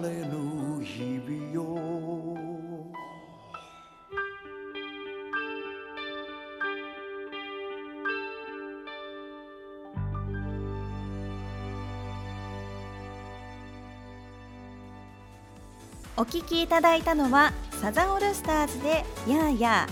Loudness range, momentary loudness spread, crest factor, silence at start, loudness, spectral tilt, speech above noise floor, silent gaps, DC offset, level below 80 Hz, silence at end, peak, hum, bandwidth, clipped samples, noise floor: 15 LU; 22 LU; 22 dB; 0 s; -30 LUFS; -5 dB/octave; 26 dB; none; under 0.1%; -46 dBFS; 0 s; -8 dBFS; none; over 20 kHz; under 0.1%; -51 dBFS